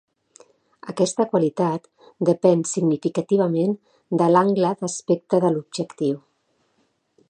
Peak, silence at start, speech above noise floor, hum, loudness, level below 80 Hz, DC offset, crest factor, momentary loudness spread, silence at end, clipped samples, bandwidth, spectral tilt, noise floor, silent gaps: -4 dBFS; 0.85 s; 47 dB; none; -21 LUFS; -72 dBFS; under 0.1%; 20 dB; 11 LU; 1.1 s; under 0.1%; 9.8 kHz; -6.5 dB/octave; -68 dBFS; none